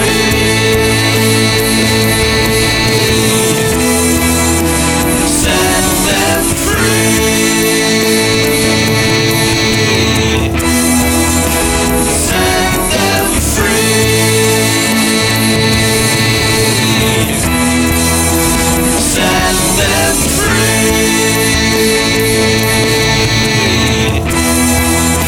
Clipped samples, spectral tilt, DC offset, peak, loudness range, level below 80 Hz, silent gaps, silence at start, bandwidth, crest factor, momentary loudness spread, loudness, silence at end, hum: under 0.1%; -3.5 dB/octave; under 0.1%; 0 dBFS; 1 LU; -24 dBFS; none; 0 s; over 20 kHz; 10 dB; 2 LU; -10 LUFS; 0 s; none